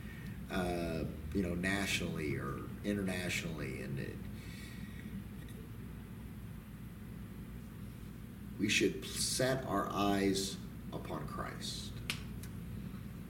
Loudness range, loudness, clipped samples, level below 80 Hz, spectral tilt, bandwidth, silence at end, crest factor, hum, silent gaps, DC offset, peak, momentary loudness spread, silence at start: 13 LU; -38 LUFS; under 0.1%; -52 dBFS; -4.5 dB/octave; 17 kHz; 0 s; 22 dB; 60 Hz at -55 dBFS; none; under 0.1%; -16 dBFS; 16 LU; 0 s